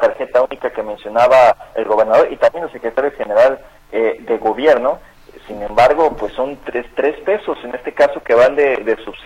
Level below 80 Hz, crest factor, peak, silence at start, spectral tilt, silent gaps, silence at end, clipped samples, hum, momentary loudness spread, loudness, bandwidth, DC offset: -44 dBFS; 14 dB; -2 dBFS; 0 s; -5 dB/octave; none; 0 s; under 0.1%; none; 13 LU; -15 LUFS; 11 kHz; under 0.1%